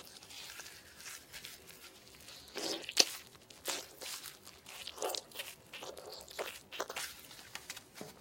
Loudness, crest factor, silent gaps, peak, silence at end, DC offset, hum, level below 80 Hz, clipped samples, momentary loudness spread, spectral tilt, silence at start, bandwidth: -40 LUFS; 38 dB; none; -6 dBFS; 0 s; under 0.1%; none; -74 dBFS; under 0.1%; 16 LU; 0 dB/octave; 0 s; 17 kHz